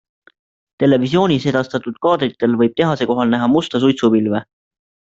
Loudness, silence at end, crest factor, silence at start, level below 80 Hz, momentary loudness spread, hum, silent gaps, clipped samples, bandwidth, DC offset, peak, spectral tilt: -16 LUFS; 0.7 s; 14 dB; 0.8 s; -56 dBFS; 5 LU; none; none; under 0.1%; 7.8 kHz; under 0.1%; -2 dBFS; -7 dB/octave